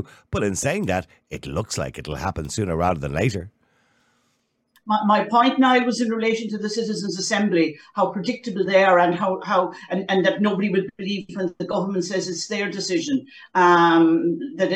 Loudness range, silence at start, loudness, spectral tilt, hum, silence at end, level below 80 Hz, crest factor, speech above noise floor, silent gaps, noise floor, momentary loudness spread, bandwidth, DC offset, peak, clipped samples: 6 LU; 0 s; -21 LUFS; -5 dB/octave; none; 0 s; -48 dBFS; 18 dB; 48 dB; none; -69 dBFS; 12 LU; 13.5 kHz; under 0.1%; -4 dBFS; under 0.1%